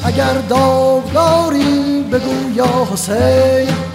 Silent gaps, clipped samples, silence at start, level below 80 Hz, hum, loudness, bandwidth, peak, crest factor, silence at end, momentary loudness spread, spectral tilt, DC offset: none; under 0.1%; 0 s; -40 dBFS; none; -13 LUFS; 16 kHz; -2 dBFS; 12 dB; 0 s; 5 LU; -5.5 dB/octave; under 0.1%